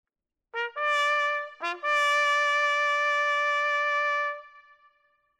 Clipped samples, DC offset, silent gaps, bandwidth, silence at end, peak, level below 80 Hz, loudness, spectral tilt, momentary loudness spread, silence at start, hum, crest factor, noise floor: under 0.1%; under 0.1%; none; 13 kHz; 0.8 s; -14 dBFS; -86 dBFS; -25 LUFS; 2.5 dB/octave; 10 LU; 0.55 s; none; 14 dB; -69 dBFS